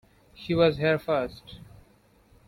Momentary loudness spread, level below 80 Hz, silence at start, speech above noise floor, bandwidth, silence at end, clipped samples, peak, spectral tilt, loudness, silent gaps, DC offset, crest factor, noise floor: 23 LU; -54 dBFS; 0.4 s; 35 dB; 16 kHz; 0.85 s; under 0.1%; -10 dBFS; -7.5 dB/octave; -25 LUFS; none; under 0.1%; 20 dB; -60 dBFS